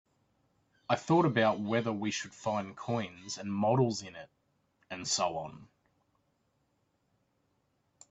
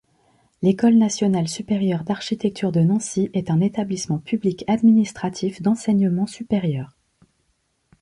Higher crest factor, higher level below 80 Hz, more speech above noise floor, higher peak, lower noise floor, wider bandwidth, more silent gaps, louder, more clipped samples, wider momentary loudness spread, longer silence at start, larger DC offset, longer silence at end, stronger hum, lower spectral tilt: first, 22 dB vs 14 dB; second, -72 dBFS vs -58 dBFS; second, 45 dB vs 49 dB; second, -12 dBFS vs -6 dBFS; first, -76 dBFS vs -69 dBFS; second, 8.4 kHz vs 11.5 kHz; neither; second, -32 LUFS vs -21 LUFS; neither; first, 16 LU vs 9 LU; first, 0.9 s vs 0.6 s; neither; first, 2.45 s vs 1.15 s; neither; second, -5 dB/octave vs -6.5 dB/octave